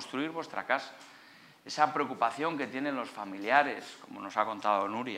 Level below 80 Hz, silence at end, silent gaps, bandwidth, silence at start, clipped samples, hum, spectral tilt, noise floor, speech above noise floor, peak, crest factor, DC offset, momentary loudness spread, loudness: -88 dBFS; 0 s; none; 15.5 kHz; 0 s; under 0.1%; none; -4 dB/octave; -57 dBFS; 24 dB; -10 dBFS; 22 dB; under 0.1%; 17 LU; -32 LUFS